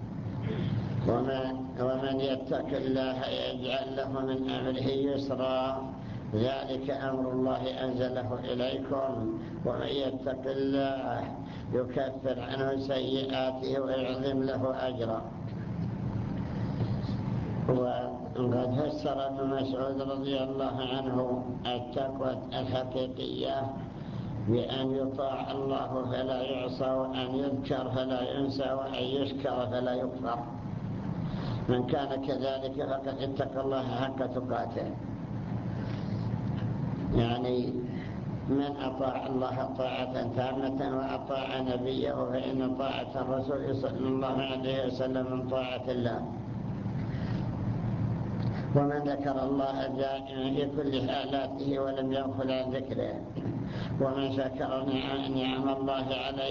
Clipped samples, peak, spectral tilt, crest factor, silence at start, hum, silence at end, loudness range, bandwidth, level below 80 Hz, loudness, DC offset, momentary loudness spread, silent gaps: under 0.1%; -14 dBFS; -8 dB/octave; 18 dB; 0 s; none; 0 s; 2 LU; 7 kHz; -52 dBFS; -32 LUFS; under 0.1%; 5 LU; none